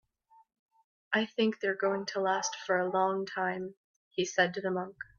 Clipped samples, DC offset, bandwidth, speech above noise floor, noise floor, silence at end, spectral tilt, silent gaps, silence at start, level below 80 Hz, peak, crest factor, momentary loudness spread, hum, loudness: under 0.1%; under 0.1%; 7.4 kHz; 34 dB; -65 dBFS; 0.15 s; -3.5 dB/octave; 3.77-4.11 s; 1.1 s; -78 dBFS; -12 dBFS; 20 dB; 7 LU; none; -31 LUFS